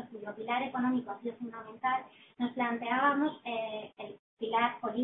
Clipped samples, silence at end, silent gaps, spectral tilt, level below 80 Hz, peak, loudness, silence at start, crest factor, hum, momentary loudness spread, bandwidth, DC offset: under 0.1%; 0 s; 4.19-4.37 s; -2 dB/octave; -80 dBFS; -14 dBFS; -33 LUFS; 0 s; 20 dB; none; 15 LU; 4 kHz; under 0.1%